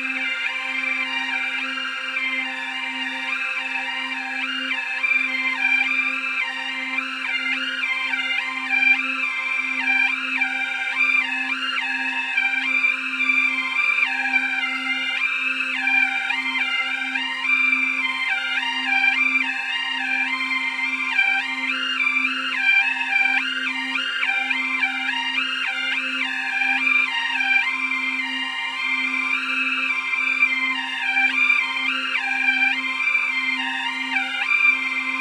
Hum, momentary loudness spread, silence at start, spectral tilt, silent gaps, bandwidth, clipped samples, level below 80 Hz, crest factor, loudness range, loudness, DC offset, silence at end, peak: none; 6 LU; 0 s; 0.5 dB/octave; none; 13 kHz; under 0.1%; -78 dBFS; 16 dB; 2 LU; -20 LUFS; under 0.1%; 0 s; -6 dBFS